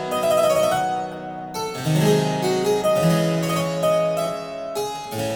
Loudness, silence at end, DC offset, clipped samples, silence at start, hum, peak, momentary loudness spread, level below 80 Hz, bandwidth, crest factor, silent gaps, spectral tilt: -21 LUFS; 0 s; under 0.1%; under 0.1%; 0 s; none; -6 dBFS; 10 LU; -54 dBFS; over 20 kHz; 16 dB; none; -5.5 dB/octave